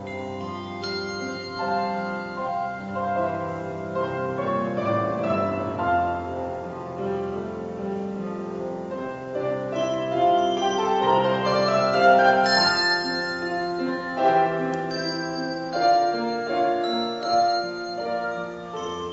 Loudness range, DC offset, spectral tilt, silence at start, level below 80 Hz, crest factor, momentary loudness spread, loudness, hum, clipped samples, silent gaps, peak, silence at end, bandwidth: 9 LU; under 0.1%; -5 dB/octave; 0 s; -58 dBFS; 20 dB; 12 LU; -24 LUFS; none; under 0.1%; none; -6 dBFS; 0 s; 8 kHz